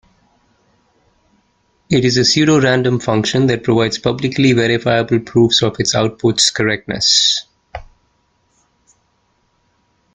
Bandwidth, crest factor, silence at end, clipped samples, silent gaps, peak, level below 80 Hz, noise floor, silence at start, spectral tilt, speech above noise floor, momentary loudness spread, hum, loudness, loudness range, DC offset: 9.6 kHz; 16 dB; 2.3 s; under 0.1%; none; 0 dBFS; -48 dBFS; -62 dBFS; 1.9 s; -4 dB/octave; 48 dB; 7 LU; none; -14 LUFS; 3 LU; under 0.1%